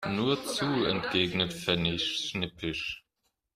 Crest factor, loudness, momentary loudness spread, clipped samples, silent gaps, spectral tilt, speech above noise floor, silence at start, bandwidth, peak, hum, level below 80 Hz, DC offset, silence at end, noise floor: 20 dB; -29 LUFS; 6 LU; under 0.1%; none; -4.5 dB/octave; 49 dB; 0 s; 15.5 kHz; -12 dBFS; none; -58 dBFS; under 0.1%; 0.55 s; -80 dBFS